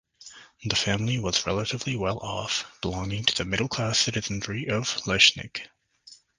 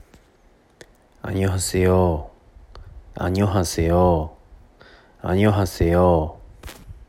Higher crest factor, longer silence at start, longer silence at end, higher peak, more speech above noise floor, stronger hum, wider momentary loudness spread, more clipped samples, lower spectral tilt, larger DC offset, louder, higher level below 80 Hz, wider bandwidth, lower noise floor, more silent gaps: first, 26 dB vs 18 dB; second, 0.2 s vs 1.25 s; first, 0.25 s vs 0.05 s; about the same, -2 dBFS vs -4 dBFS; second, 27 dB vs 37 dB; neither; second, 15 LU vs 23 LU; neither; second, -3 dB/octave vs -6.5 dB/octave; neither; second, -25 LUFS vs -20 LUFS; second, -50 dBFS vs -40 dBFS; second, 10.5 kHz vs 15.5 kHz; about the same, -54 dBFS vs -56 dBFS; neither